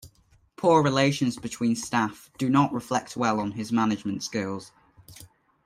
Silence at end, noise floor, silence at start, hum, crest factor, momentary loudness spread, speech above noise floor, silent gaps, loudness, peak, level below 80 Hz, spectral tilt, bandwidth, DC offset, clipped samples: 0.4 s; -61 dBFS; 0.05 s; none; 18 dB; 10 LU; 36 dB; none; -25 LUFS; -8 dBFS; -62 dBFS; -5.5 dB/octave; 15.5 kHz; under 0.1%; under 0.1%